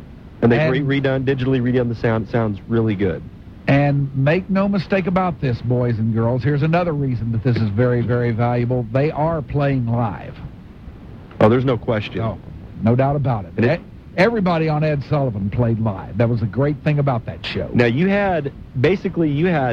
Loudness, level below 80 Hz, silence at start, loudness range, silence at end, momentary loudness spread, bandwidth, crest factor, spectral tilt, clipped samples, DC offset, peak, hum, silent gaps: -19 LUFS; -40 dBFS; 0 s; 2 LU; 0 s; 9 LU; 6.4 kHz; 18 dB; -9.5 dB/octave; under 0.1%; under 0.1%; -2 dBFS; none; none